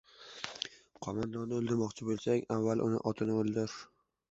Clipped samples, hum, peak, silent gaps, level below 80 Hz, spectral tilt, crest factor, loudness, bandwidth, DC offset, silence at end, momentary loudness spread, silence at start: under 0.1%; none; -16 dBFS; none; -68 dBFS; -6 dB/octave; 20 dB; -35 LUFS; 8 kHz; under 0.1%; 0.45 s; 12 LU; 0.2 s